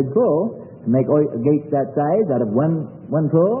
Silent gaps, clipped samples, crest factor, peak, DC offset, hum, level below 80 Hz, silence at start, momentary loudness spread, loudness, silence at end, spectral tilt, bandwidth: none; under 0.1%; 14 dB; -4 dBFS; under 0.1%; none; -62 dBFS; 0 s; 7 LU; -19 LUFS; 0 s; -15.5 dB/octave; 3 kHz